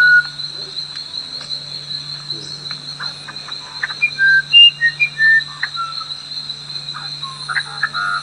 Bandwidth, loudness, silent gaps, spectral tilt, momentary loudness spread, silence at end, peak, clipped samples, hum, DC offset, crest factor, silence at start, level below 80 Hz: 10.5 kHz; -16 LUFS; none; -0.5 dB/octave; 17 LU; 0 s; 0 dBFS; under 0.1%; none; under 0.1%; 18 dB; 0 s; -64 dBFS